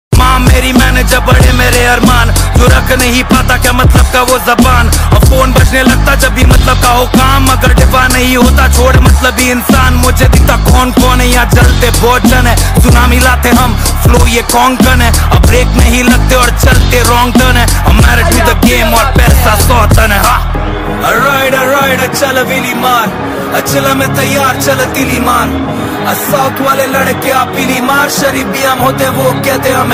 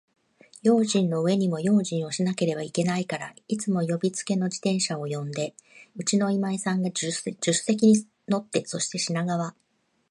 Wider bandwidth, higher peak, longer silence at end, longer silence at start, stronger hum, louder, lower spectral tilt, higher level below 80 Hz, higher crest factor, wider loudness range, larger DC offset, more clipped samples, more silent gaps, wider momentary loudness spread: first, 16.5 kHz vs 11.5 kHz; first, 0 dBFS vs -8 dBFS; second, 0 s vs 0.6 s; second, 0.1 s vs 0.65 s; neither; first, -7 LUFS vs -26 LUFS; about the same, -4.5 dB/octave vs -5 dB/octave; first, -12 dBFS vs -72 dBFS; second, 6 dB vs 18 dB; about the same, 3 LU vs 3 LU; neither; first, 0.7% vs under 0.1%; neither; second, 4 LU vs 9 LU